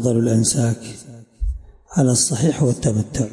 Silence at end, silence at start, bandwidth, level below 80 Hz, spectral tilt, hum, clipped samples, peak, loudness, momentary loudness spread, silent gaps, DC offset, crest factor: 0 s; 0 s; 11.5 kHz; -34 dBFS; -5.5 dB/octave; none; under 0.1%; -4 dBFS; -19 LUFS; 15 LU; none; under 0.1%; 14 dB